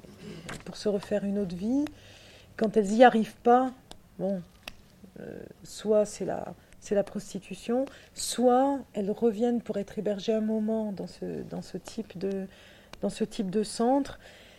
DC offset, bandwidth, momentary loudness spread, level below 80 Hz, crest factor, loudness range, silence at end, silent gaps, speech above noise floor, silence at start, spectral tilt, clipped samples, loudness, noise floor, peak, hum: under 0.1%; 15.5 kHz; 20 LU; -58 dBFS; 24 dB; 7 LU; 0.15 s; none; 23 dB; 0.05 s; -5.5 dB/octave; under 0.1%; -29 LUFS; -51 dBFS; -6 dBFS; none